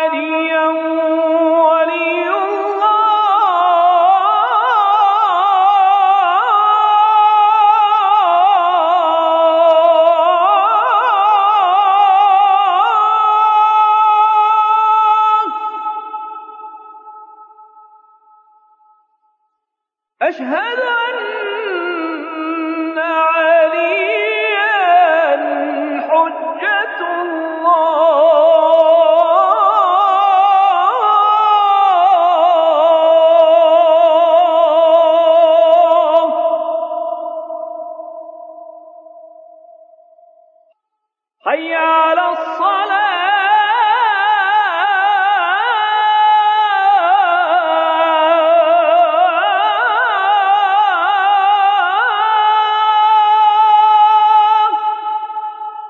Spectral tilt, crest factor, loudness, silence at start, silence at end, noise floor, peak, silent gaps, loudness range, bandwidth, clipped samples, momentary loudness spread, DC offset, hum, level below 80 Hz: -2 dB/octave; 12 dB; -12 LUFS; 0 s; 0 s; -80 dBFS; -2 dBFS; none; 10 LU; 7 kHz; under 0.1%; 10 LU; under 0.1%; none; -82 dBFS